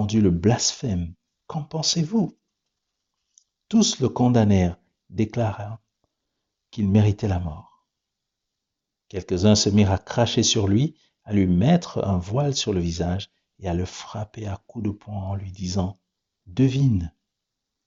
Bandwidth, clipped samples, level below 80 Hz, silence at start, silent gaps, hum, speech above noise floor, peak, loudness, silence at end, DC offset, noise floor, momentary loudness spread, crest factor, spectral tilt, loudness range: 7.8 kHz; under 0.1%; -50 dBFS; 0 s; none; none; 62 dB; -6 dBFS; -23 LUFS; 0.75 s; under 0.1%; -83 dBFS; 15 LU; 18 dB; -6.5 dB/octave; 7 LU